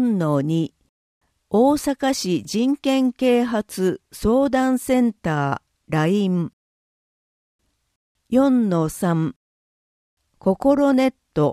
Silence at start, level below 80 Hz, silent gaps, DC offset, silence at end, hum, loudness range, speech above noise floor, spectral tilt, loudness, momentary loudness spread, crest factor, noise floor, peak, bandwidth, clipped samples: 0 s; -50 dBFS; 0.89-1.21 s, 6.53-7.59 s, 7.96-8.15 s, 9.36-10.17 s; under 0.1%; 0 s; none; 3 LU; over 71 dB; -6.5 dB/octave; -20 LUFS; 7 LU; 16 dB; under -90 dBFS; -4 dBFS; 15.5 kHz; under 0.1%